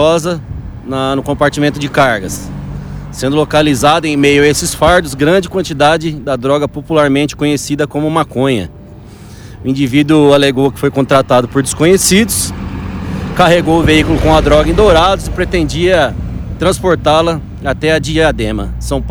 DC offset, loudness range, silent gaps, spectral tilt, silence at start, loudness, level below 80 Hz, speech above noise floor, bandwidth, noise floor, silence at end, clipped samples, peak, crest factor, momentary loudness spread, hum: under 0.1%; 4 LU; none; -5 dB/octave; 0 s; -11 LUFS; -26 dBFS; 21 dB; over 20 kHz; -32 dBFS; 0 s; under 0.1%; 0 dBFS; 12 dB; 13 LU; none